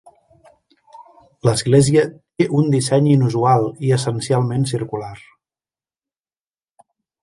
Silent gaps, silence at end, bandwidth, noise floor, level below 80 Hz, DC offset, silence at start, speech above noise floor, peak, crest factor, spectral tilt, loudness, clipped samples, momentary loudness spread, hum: none; 2.05 s; 11.5 kHz; under -90 dBFS; -54 dBFS; under 0.1%; 0.95 s; over 74 dB; -2 dBFS; 18 dB; -6.5 dB/octave; -17 LUFS; under 0.1%; 10 LU; none